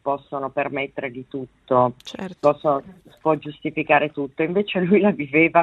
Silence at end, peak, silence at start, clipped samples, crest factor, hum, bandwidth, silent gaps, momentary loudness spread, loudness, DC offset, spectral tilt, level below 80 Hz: 0 s; -2 dBFS; 0.05 s; under 0.1%; 20 dB; none; 8 kHz; none; 13 LU; -22 LUFS; under 0.1%; -7.5 dB/octave; -62 dBFS